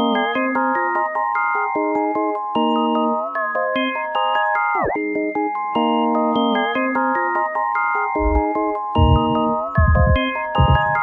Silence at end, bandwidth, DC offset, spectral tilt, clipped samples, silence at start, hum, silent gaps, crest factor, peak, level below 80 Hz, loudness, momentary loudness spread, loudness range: 0 s; 4.5 kHz; under 0.1%; -9 dB/octave; under 0.1%; 0 s; none; none; 16 dB; -2 dBFS; -30 dBFS; -19 LUFS; 5 LU; 2 LU